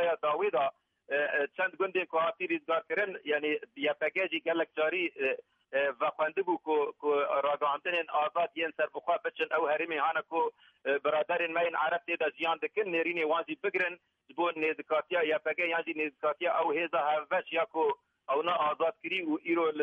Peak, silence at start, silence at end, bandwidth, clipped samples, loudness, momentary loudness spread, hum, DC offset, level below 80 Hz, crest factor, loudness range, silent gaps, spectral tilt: -18 dBFS; 0 s; 0 s; 5.8 kHz; under 0.1%; -31 LUFS; 4 LU; none; under 0.1%; -86 dBFS; 14 dB; 1 LU; none; -6 dB/octave